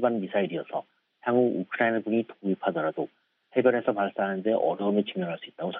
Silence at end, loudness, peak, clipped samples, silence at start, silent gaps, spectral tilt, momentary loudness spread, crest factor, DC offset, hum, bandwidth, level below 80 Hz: 0 s; -28 LUFS; -8 dBFS; under 0.1%; 0 s; none; -5 dB/octave; 10 LU; 18 dB; under 0.1%; none; 4 kHz; -78 dBFS